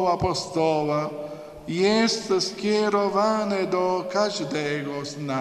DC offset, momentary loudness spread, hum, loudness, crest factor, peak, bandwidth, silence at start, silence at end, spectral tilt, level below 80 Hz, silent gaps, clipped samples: under 0.1%; 10 LU; none; -24 LUFS; 16 dB; -8 dBFS; 13 kHz; 0 s; 0 s; -4.5 dB/octave; -54 dBFS; none; under 0.1%